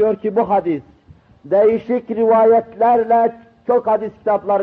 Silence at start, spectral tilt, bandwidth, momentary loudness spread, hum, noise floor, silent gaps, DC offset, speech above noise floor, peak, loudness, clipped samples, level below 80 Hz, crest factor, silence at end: 0 s; -9.5 dB/octave; 4.3 kHz; 8 LU; none; -47 dBFS; none; under 0.1%; 32 dB; -4 dBFS; -16 LUFS; under 0.1%; -58 dBFS; 12 dB; 0 s